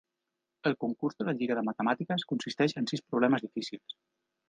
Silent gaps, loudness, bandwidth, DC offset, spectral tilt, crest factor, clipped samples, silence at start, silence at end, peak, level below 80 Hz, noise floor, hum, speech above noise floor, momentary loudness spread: none; -31 LUFS; 9.4 kHz; under 0.1%; -6 dB/octave; 20 dB; under 0.1%; 0.65 s; 0.6 s; -12 dBFS; -78 dBFS; -86 dBFS; none; 55 dB; 11 LU